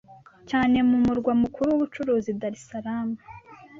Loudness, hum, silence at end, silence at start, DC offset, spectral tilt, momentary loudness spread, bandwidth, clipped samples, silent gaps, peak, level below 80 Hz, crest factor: -24 LUFS; none; 0 s; 0.1 s; under 0.1%; -7 dB/octave; 12 LU; 7.6 kHz; under 0.1%; none; -10 dBFS; -52 dBFS; 14 dB